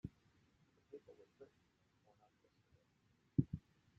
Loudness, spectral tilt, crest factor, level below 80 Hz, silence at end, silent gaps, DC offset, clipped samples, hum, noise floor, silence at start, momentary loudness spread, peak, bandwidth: -44 LUFS; -11.5 dB/octave; 30 dB; -70 dBFS; 0.4 s; none; under 0.1%; under 0.1%; none; -78 dBFS; 0.05 s; 24 LU; -20 dBFS; 7.2 kHz